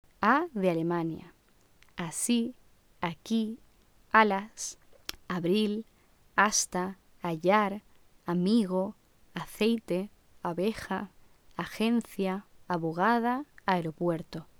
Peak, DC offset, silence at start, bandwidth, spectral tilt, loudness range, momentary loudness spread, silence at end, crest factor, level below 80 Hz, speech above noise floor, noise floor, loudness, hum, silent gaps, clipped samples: -6 dBFS; under 0.1%; 0.2 s; 19 kHz; -4.5 dB/octave; 4 LU; 15 LU; 0.15 s; 24 dB; -62 dBFS; 34 dB; -63 dBFS; -30 LUFS; none; none; under 0.1%